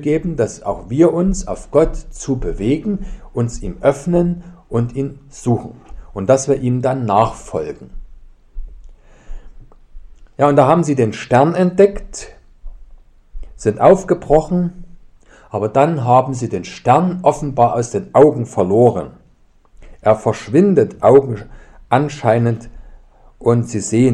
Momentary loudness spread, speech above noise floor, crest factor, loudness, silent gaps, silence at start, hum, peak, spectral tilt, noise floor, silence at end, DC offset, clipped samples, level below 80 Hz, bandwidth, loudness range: 13 LU; 36 dB; 16 dB; -16 LUFS; none; 0 s; none; 0 dBFS; -7 dB/octave; -50 dBFS; 0 s; under 0.1%; under 0.1%; -34 dBFS; 11 kHz; 5 LU